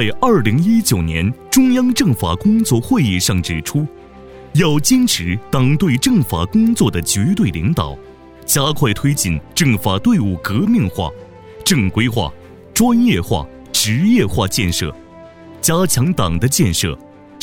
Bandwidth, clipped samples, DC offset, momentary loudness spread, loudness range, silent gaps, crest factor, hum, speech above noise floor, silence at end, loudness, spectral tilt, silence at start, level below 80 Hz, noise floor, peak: over 20 kHz; under 0.1%; under 0.1%; 8 LU; 2 LU; none; 14 dB; none; 24 dB; 0 s; -15 LUFS; -4.5 dB/octave; 0 s; -36 dBFS; -38 dBFS; -2 dBFS